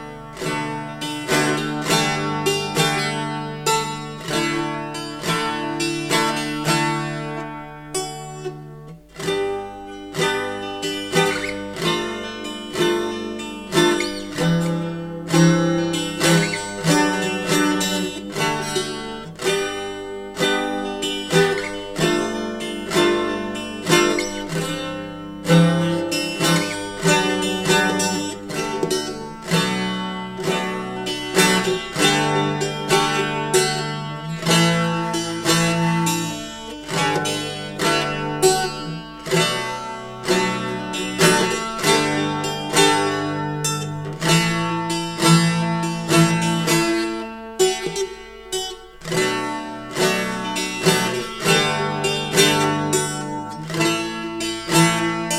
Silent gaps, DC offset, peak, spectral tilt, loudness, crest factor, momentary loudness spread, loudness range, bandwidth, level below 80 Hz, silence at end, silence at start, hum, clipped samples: none; under 0.1%; -2 dBFS; -4 dB/octave; -20 LUFS; 20 dB; 12 LU; 4 LU; 16.5 kHz; -50 dBFS; 0 s; 0 s; none; under 0.1%